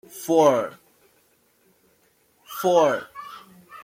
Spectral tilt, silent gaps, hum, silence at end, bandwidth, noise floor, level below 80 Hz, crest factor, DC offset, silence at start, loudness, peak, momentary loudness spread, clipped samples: -4.5 dB/octave; none; none; 0 s; 16.5 kHz; -63 dBFS; -72 dBFS; 20 dB; under 0.1%; 0.15 s; -21 LUFS; -6 dBFS; 22 LU; under 0.1%